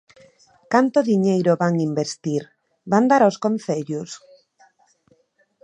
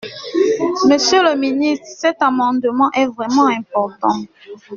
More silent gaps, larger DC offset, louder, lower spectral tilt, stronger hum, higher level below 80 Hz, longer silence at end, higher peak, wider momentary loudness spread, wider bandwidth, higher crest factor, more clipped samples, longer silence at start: neither; neither; second, -20 LUFS vs -16 LUFS; first, -6.5 dB/octave vs -2 dB/octave; neither; second, -70 dBFS vs -60 dBFS; first, 1.45 s vs 0 s; about the same, -2 dBFS vs -2 dBFS; first, 12 LU vs 7 LU; first, 10 kHz vs 7.4 kHz; first, 20 dB vs 14 dB; neither; first, 0.7 s vs 0 s